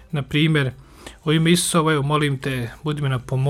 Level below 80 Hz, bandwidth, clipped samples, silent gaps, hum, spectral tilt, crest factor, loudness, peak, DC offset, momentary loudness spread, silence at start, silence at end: -46 dBFS; 16 kHz; under 0.1%; none; none; -5 dB/octave; 18 dB; -20 LUFS; -4 dBFS; under 0.1%; 10 LU; 0 s; 0 s